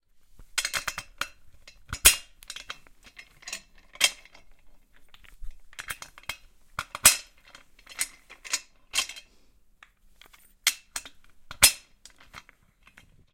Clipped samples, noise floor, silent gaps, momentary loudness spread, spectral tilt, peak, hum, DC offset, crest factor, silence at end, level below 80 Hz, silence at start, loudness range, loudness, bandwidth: under 0.1%; -59 dBFS; none; 24 LU; 1 dB/octave; 0 dBFS; none; under 0.1%; 30 dB; 0.95 s; -50 dBFS; 0.4 s; 7 LU; -25 LUFS; 16.5 kHz